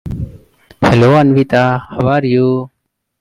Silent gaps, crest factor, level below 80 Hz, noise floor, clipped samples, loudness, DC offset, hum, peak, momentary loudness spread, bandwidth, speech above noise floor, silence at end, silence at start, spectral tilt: none; 12 dB; -38 dBFS; -41 dBFS; under 0.1%; -12 LUFS; under 0.1%; none; 0 dBFS; 16 LU; 11.5 kHz; 31 dB; 0.55 s; 0.05 s; -8 dB/octave